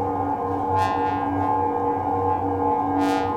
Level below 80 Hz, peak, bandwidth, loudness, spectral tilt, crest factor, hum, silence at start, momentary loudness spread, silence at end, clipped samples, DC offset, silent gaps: -52 dBFS; -10 dBFS; 14 kHz; -23 LUFS; -7.5 dB/octave; 12 dB; none; 0 s; 3 LU; 0 s; under 0.1%; under 0.1%; none